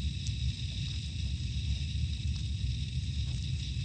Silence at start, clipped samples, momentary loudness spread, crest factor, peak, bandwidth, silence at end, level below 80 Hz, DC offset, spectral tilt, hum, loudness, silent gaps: 0 s; under 0.1%; 2 LU; 14 dB; -20 dBFS; 9 kHz; 0 s; -38 dBFS; under 0.1%; -4.5 dB/octave; none; -35 LUFS; none